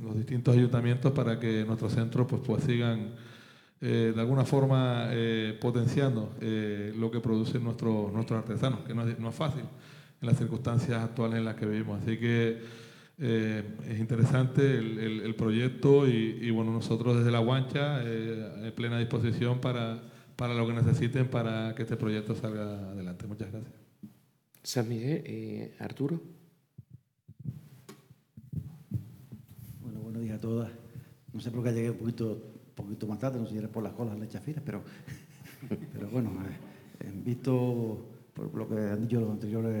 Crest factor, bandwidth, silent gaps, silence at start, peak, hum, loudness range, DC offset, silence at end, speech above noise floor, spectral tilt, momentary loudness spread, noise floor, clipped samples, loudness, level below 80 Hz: 20 dB; 15 kHz; none; 0 s; -12 dBFS; none; 11 LU; under 0.1%; 0 s; 35 dB; -7.5 dB/octave; 17 LU; -65 dBFS; under 0.1%; -31 LUFS; -68 dBFS